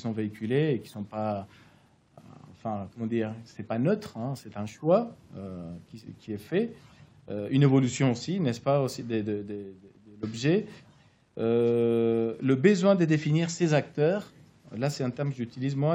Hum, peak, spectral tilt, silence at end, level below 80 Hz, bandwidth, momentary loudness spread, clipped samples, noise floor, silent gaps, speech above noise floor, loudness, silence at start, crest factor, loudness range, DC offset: none; -8 dBFS; -7 dB/octave; 0 s; -70 dBFS; 16 kHz; 18 LU; under 0.1%; -61 dBFS; none; 33 dB; -28 LUFS; 0 s; 20 dB; 8 LU; under 0.1%